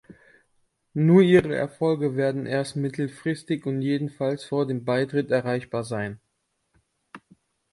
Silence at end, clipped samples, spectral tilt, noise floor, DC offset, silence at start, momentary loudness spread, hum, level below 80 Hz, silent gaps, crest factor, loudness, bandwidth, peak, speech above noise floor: 0.55 s; under 0.1%; -7.5 dB/octave; -75 dBFS; under 0.1%; 0.1 s; 11 LU; none; -62 dBFS; none; 18 dB; -24 LUFS; 11.5 kHz; -6 dBFS; 52 dB